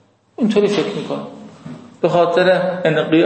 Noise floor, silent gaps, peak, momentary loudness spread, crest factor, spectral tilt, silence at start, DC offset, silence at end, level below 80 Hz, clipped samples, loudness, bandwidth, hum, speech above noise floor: -36 dBFS; none; -2 dBFS; 22 LU; 14 dB; -6.5 dB/octave; 0.4 s; under 0.1%; 0 s; -64 dBFS; under 0.1%; -17 LUFS; 8.8 kHz; none; 20 dB